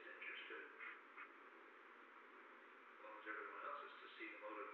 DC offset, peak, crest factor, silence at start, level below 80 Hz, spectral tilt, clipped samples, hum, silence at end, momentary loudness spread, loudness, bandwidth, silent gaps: under 0.1%; -36 dBFS; 20 dB; 0 s; under -90 dBFS; 3.5 dB/octave; under 0.1%; none; 0 s; 11 LU; -55 LUFS; 6 kHz; none